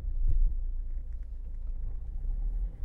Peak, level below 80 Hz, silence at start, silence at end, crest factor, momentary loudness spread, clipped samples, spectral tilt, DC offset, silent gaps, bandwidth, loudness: -16 dBFS; -30 dBFS; 0 s; 0 s; 14 dB; 10 LU; under 0.1%; -10 dB/octave; under 0.1%; none; 0.9 kHz; -38 LUFS